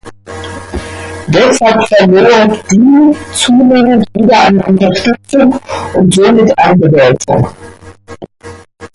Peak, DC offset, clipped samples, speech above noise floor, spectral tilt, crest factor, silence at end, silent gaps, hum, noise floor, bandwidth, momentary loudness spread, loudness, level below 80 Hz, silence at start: 0 dBFS; under 0.1%; under 0.1%; 25 dB; -5.5 dB/octave; 8 dB; 0.1 s; none; none; -32 dBFS; 11.5 kHz; 16 LU; -8 LUFS; -36 dBFS; 0.05 s